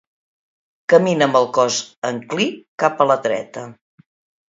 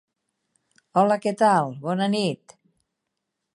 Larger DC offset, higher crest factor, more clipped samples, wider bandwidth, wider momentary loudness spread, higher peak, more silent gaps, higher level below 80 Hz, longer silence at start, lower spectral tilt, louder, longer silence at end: neither; about the same, 18 dB vs 20 dB; neither; second, 7.8 kHz vs 11.5 kHz; first, 15 LU vs 8 LU; first, 0 dBFS vs -6 dBFS; first, 1.97-2.02 s, 2.68-2.78 s vs none; first, -70 dBFS vs -78 dBFS; about the same, 0.9 s vs 0.95 s; second, -4 dB/octave vs -6 dB/octave; first, -18 LUFS vs -22 LUFS; second, 0.75 s vs 1.2 s